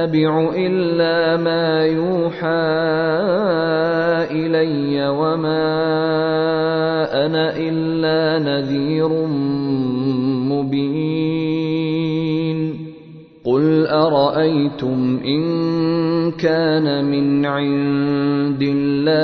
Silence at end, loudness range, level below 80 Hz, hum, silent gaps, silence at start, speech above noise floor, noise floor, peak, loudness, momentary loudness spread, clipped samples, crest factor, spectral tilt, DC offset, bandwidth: 0 s; 2 LU; -54 dBFS; none; none; 0 s; 23 dB; -40 dBFS; -4 dBFS; -18 LUFS; 4 LU; under 0.1%; 14 dB; -9 dB/octave; under 0.1%; 6 kHz